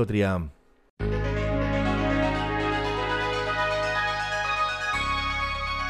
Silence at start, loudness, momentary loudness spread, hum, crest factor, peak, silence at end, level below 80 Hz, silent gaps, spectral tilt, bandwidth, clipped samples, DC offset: 0 s; -26 LUFS; 3 LU; none; 16 dB; -10 dBFS; 0 s; -36 dBFS; 0.90-0.97 s; -5.5 dB/octave; 13 kHz; under 0.1%; under 0.1%